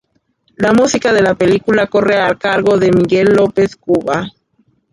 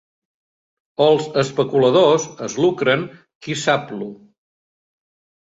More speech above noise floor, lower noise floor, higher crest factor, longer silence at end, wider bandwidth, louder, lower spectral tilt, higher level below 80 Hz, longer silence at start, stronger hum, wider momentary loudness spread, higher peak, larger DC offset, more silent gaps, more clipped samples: second, 48 dB vs over 72 dB; second, -60 dBFS vs under -90 dBFS; second, 12 dB vs 18 dB; second, 0.65 s vs 1.3 s; first, 11.5 kHz vs 8 kHz; first, -13 LUFS vs -18 LUFS; about the same, -5.5 dB/octave vs -5 dB/octave; first, -46 dBFS vs -62 dBFS; second, 0.6 s vs 1 s; neither; second, 5 LU vs 18 LU; about the same, -2 dBFS vs -2 dBFS; neither; second, none vs 3.35-3.41 s; neither